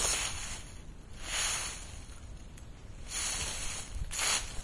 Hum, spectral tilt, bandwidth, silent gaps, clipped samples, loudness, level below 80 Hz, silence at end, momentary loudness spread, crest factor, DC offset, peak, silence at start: none; -0.5 dB/octave; 12 kHz; none; under 0.1%; -34 LUFS; -46 dBFS; 0 s; 21 LU; 20 dB; 0.1%; -18 dBFS; 0 s